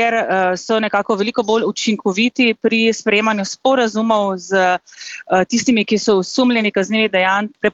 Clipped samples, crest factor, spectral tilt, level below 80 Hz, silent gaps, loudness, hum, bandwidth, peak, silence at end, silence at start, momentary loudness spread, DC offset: under 0.1%; 14 dB; -4 dB/octave; -60 dBFS; none; -16 LUFS; none; 8 kHz; -2 dBFS; 0.05 s; 0 s; 4 LU; under 0.1%